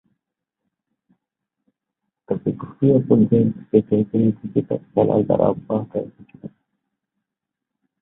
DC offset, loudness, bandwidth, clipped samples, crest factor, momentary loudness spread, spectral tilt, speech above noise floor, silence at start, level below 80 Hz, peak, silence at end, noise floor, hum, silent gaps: under 0.1%; -20 LUFS; 3.8 kHz; under 0.1%; 20 dB; 13 LU; -14 dB/octave; 65 dB; 2.3 s; -56 dBFS; -2 dBFS; 1.55 s; -84 dBFS; none; none